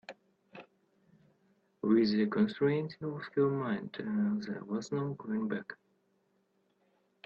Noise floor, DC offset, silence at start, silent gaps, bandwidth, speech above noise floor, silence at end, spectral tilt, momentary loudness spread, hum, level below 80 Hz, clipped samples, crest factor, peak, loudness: -75 dBFS; under 0.1%; 0.1 s; none; 7.2 kHz; 42 dB; 1.5 s; -7.5 dB/octave; 21 LU; none; -76 dBFS; under 0.1%; 18 dB; -16 dBFS; -33 LUFS